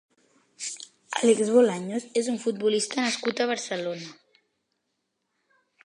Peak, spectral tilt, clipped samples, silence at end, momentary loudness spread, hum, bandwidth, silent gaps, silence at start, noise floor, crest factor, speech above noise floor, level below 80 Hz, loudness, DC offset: -8 dBFS; -3.5 dB/octave; under 0.1%; 1.7 s; 15 LU; none; 11 kHz; none; 0.6 s; -79 dBFS; 20 dB; 54 dB; -80 dBFS; -26 LUFS; under 0.1%